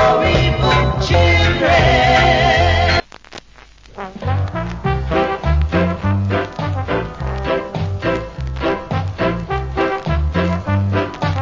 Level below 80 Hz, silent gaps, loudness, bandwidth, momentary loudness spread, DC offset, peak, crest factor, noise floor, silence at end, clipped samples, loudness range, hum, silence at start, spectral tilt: -24 dBFS; none; -16 LUFS; 7.6 kHz; 11 LU; under 0.1%; -2 dBFS; 14 dB; -43 dBFS; 0 s; under 0.1%; 7 LU; none; 0 s; -6 dB/octave